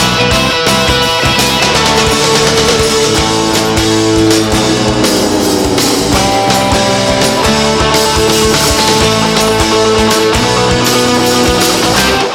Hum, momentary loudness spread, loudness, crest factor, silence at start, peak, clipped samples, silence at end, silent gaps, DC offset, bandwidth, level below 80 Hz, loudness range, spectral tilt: none; 2 LU; -9 LUFS; 10 dB; 0 s; 0 dBFS; under 0.1%; 0 s; none; under 0.1%; 19.5 kHz; -26 dBFS; 1 LU; -3.5 dB/octave